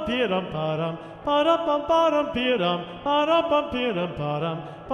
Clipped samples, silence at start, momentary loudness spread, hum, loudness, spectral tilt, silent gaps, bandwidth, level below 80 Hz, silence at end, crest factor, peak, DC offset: under 0.1%; 0 s; 8 LU; none; -24 LUFS; -6.5 dB/octave; none; 9.4 kHz; -52 dBFS; 0 s; 16 dB; -8 dBFS; under 0.1%